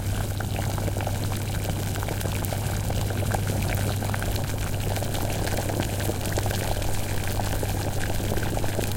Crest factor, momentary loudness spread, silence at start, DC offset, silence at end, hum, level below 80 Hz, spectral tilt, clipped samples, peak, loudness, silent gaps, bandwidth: 18 dB; 2 LU; 0 s; under 0.1%; 0 s; none; -34 dBFS; -5 dB/octave; under 0.1%; -8 dBFS; -28 LUFS; none; 17 kHz